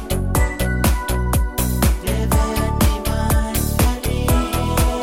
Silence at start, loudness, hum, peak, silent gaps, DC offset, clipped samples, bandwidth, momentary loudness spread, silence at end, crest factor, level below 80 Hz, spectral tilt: 0 s; -19 LUFS; none; -2 dBFS; none; 0.4%; under 0.1%; 17 kHz; 2 LU; 0 s; 16 dB; -20 dBFS; -5 dB/octave